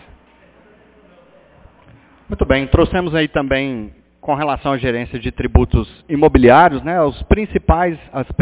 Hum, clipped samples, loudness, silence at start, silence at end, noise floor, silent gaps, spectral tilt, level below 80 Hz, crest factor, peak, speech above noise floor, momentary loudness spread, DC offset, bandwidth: none; under 0.1%; -16 LUFS; 2.3 s; 0 s; -49 dBFS; none; -11 dB/octave; -26 dBFS; 16 dB; 0 dBFS; 34 dB; 13 LU; under 0.1%; 4 kHz